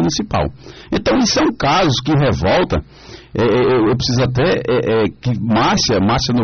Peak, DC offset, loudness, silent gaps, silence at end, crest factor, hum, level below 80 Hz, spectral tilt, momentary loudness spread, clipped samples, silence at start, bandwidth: -6 dBFS; under 0.1%; -15 LUFS; none; 0 s; 10 dB; none; -34 dBFS; -4.5 dB/octave; 7 LU; under 0.1%; 0 s; 6.8 kHz